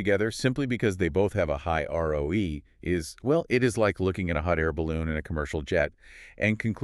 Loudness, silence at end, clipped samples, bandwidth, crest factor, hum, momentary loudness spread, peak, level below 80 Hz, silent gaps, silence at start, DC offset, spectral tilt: -27 LUFS; 0 s; under 0.1%; 13 kHz; 18 dB; none; 6 LU; -8 dBFS; -42 dBFS; none; 0 s; under 0.1%; -6.5 dB/octave